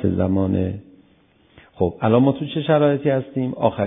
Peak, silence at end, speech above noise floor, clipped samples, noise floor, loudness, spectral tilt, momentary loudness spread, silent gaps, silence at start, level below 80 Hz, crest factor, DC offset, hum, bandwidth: -2 dBFS; 0 s; 37 dB; under 0.1%; -56 dBFS; -20 LUFS; -12.5 dB/octave; 8 LU; none; 0 s; -40 dBFS; 18 dB; under 0.1%; none; 3.8 kHz